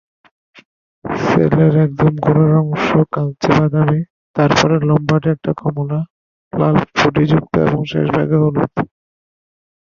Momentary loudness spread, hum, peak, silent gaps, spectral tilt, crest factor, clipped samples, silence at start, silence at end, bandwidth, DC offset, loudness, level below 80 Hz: 9 LU; none; 0 dBFS; 4.10-4.34 s, 6.10-6.51 s; -7.5 dB/octave; 14 dB; under 0.1%; 1.05 s; 1.05 s; 7.2 kHz; under 0.1%; -15 LUFS; -44 dBFS